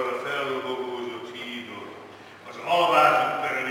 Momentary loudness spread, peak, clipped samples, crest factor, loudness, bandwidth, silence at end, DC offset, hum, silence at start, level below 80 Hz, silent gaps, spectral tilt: 23 LU; -6 dBFS; under 0.1%; 20 dB; -24 LUFS; 17 kHz; 0 s; under 0.1%; none; 0 s; -80 dBFS; none; -3.5 dB/octave